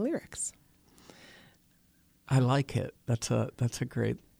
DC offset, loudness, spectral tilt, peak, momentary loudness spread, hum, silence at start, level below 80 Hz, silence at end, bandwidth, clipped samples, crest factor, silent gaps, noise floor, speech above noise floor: under 0.1%; -31 LUFS; -6 dB/octave; -14 dBFS; 10 LU; none; 0 s; -60 dBFS; 0.2 s; 15.5 kHz; under 0.1%; 18 dB; none; -66 dBFS; 36 dB